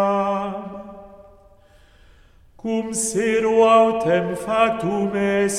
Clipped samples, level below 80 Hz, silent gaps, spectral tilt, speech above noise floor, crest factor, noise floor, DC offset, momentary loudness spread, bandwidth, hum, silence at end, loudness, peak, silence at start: under 0.1%; -52 dBFS; none; -4.5 dB/octave; 33 dB; 18 dB; -51 dBFS; under 0.1%; 18 LU; 14.5 kHz; none; 0 s; -19 LUFS; -4 dBFS; 0 s